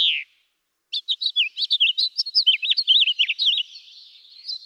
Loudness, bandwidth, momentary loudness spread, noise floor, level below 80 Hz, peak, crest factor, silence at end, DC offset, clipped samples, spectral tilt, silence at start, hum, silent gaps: -19 LUFS; 12.5 kHz; 14 LU; -73 dBFS; under -90 dBFS; -8 dBFS; 16 dB; 0 s; under 0.1%; under 0.1%; 8 dB/octave; 0 s; none; none